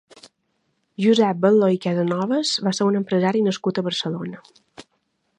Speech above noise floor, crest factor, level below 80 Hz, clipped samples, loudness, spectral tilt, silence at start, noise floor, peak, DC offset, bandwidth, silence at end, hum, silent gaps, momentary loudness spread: 51 dB; 18 dB; -70 dBFS; under 0.1%; -20 LUFS; -5.5 dB/octave; 1 s; -71 dBFS; -4 dBFS; under 0.1%; 10.5 kHz; 0.55 s; none; none; 9 LU